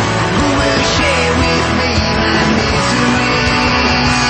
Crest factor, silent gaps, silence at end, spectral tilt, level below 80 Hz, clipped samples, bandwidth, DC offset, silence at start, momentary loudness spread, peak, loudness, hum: 12 dB; none; 0 s; -4.5 dB/octave; -26 dBFS; under 0.1%; 8.8 kHz; under 0.1%; 0 s; 2 LU; 0 dBFS; -12 LUFS; none